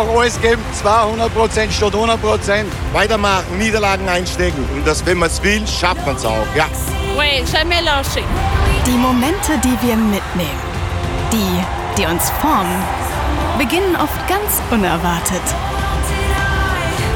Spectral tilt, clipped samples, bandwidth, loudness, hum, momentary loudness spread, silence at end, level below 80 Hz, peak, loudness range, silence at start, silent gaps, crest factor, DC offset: -4.5 dB/octave; under 0.1%; 19.5 kHz; -16 LUFS; none; 5 LU; 0 s; -24 dBFS; 0 dBFS; 2 LU; 0 s; none; 16 dB; under 0.1%